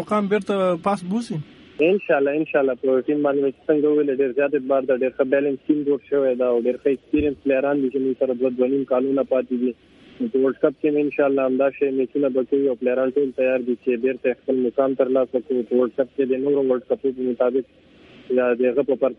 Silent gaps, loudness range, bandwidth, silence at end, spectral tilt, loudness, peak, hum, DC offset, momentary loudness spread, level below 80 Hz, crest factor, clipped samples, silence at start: none; 2 LU; 10.5 kHz; 0.05 s; -7.5 dB/octave; -21 LUFS; -4 dBFS; none; under 0.1%; 4 LU; -56 dBFS; 18 dB; under 0.1%; 0 s